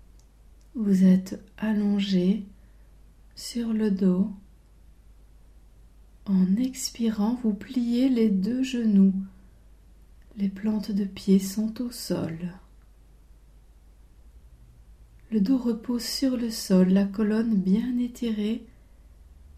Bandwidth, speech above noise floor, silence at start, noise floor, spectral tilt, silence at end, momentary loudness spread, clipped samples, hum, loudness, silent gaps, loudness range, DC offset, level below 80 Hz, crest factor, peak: 15 kHz; 29 dB; 0.75 s; -53 dBFS; -6.5 dB/octave; 0.9 s; 12 LU; under 0.1%; none; -25 LUFS; none; 7 LU; under 0.1%; -52 dBFS; 16 dB; -10 dBFS